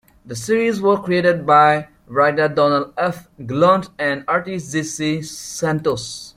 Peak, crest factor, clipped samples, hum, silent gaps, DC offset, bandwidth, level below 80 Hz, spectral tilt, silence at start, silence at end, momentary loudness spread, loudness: -2 dBFS; 16 dB; under 0.1%; none; none; under 0.1%; 15.5 kHz; -56 dBFS; -5 dB/octave; 0.25 s; 0.05 s; 12 LU; -18 LUFS